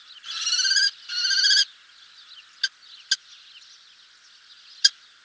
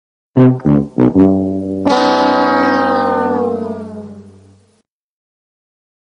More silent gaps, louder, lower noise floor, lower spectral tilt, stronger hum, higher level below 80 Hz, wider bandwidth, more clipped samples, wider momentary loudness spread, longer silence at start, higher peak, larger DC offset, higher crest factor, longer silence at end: neither; second, -21 LUFS vs -13 LUFS; second, -53 dBFS vs -59 dBFS; second, 6.5 dB/octave vs -7.5 dB/octave; neither; second, -84 dBFS vs -46 dBFS; second, 8 kHz vs 9.6 kHz; neither; about the same, 12 LU vs 13 LU; second, 0.1 s vs 0.35 s; about the same, -2 dBFS vs 0 dBFS; neither; first, 26 dB vs 14 dB; second, 0.35 s vs 1.75 s